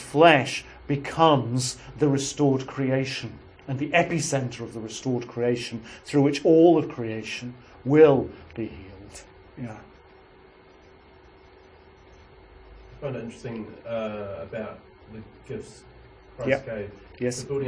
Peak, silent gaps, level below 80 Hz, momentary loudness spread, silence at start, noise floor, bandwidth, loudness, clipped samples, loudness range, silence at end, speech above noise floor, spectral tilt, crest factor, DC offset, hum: -2 dBFS; none; -54 dBFS; 23 LU; 0 s; -52 dBFS; 10.5 kHz; -24 LUFS; under 0.1%; 20 LU; 0 s; 28 dB; -5.5 dB/octave; 24 dB; under 0.1%; none